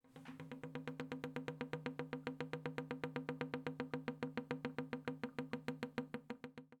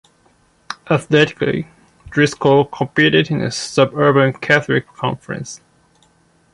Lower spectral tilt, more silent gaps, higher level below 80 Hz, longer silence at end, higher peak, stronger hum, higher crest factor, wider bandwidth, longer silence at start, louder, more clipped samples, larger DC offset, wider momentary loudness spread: first, -7 dB/octave vs -5.5 dB/octave; neither; second, -78 dBFS vs -52 dBFS; second, 0.05 s vs 1 s; second, -24 dBFS vs 0 dBFS; neither; first, 24 dB vs 16 dB; first, 15 kHz vs 11.5 kHz; second, 0.05 s vs 0.7 s; second, -47 LUFS vs -16 LUFS; neither; neither; second, 6 LU vs 15 LU